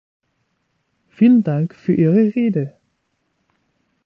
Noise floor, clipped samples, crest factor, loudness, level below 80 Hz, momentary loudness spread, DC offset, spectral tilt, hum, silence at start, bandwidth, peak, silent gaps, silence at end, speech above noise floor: -69 dBFS; under 0.1%; 16 dB; -16 LUFS; -62 dBFS; 9 LU; under 0.1%; -11 dB/octave; none; 1.2 s; 4.3 kHz; -4 dBFS; none; 1.4 s; 54 dB